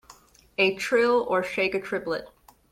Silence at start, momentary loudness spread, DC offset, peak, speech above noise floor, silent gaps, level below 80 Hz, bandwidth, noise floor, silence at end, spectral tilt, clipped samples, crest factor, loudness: 0.1 s; 11 LU; under 0.1%; -10 dBFS; 29 dB; none; -62 dBFS; 15.5 kHz; -54 dBFS; 0.45 s; -4 dB/octave; under 0.1%; 18 dB; -25 LUFS